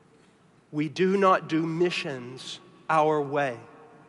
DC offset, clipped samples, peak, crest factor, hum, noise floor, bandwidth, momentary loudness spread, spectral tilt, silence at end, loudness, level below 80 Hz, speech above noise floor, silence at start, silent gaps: under 0.1%; under 0.1%; -8 dBFS; 18 dB; none; -59 dBFS; 11.5 kHz; 17 LU; -6 dB/octave; 0.25 s; -26 LUFS; -78 dBFS; 34 dB; 0.7 s; none